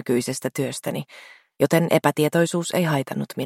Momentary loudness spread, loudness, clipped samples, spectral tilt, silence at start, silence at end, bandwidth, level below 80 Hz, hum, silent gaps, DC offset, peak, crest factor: 10 LU; -22 LUFS; under 0.1%; -5.5 dB/octave; 0.05 s; 0 s; 16.5 kHz; -66 dBFS; none; none; under 0.1%; -4 dBFS; 20 dB